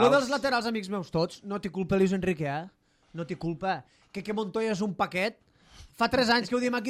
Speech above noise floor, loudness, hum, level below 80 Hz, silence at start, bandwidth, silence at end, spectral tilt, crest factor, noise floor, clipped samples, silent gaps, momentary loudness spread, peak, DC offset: 25 dB; -29 LUFS; none; -58 dBFS; 0 s; 14.5 kHz; 0 s; -5.5 dB/octave; 18 dB; -53 dBFS; under 0.1%; none; 12 LU; -10 dBFS; under 0.1%